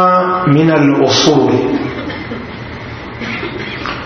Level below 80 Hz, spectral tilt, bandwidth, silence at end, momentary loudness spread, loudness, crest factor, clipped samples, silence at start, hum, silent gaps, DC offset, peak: -40 dBFS; -5.5 dB/octave; 6.6 kHz; 0 s; 17 LU; -13 LUFS; 14 dB; under 0.1%; 0 s; none; none; under 0.1%; 0 dBFS